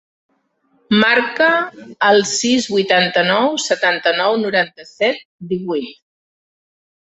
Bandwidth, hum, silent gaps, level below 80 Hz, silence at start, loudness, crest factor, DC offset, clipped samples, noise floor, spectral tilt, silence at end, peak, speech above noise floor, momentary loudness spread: 8.2 kHz; none; 5.25-5.39 s; -62 dBFS; 0.9 s; -16 LUFS; 16 dB; under 0.1%; under 0.1%; -62 dBFS; -3 dB/octave; 1.25 s; 0 dBFS; 46 dB; 11 LU